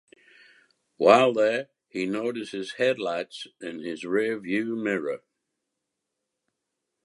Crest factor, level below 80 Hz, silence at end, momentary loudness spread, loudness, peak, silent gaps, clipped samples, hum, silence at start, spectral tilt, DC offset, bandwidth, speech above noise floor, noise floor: 24 dB; -76 dBFS; 1.9 s; 18 LU; -25 LUFS; -4 dBFS; none; under 0.1%; none; 1 s; -5 dB/octave; under 0.1%; 11.5 kHz; 58 dB; -83 dBFS